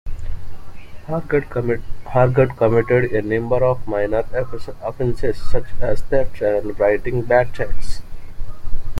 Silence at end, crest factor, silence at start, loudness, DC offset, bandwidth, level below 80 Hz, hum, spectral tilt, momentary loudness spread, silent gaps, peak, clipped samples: 0 s; 14 dB; 0.05 s; -20 LUFS; under 0.1%; 5.8 kHz; -28 dBFS; none; -8 dB/octave; 18 LU; none; -2 dBFS; under 0.1%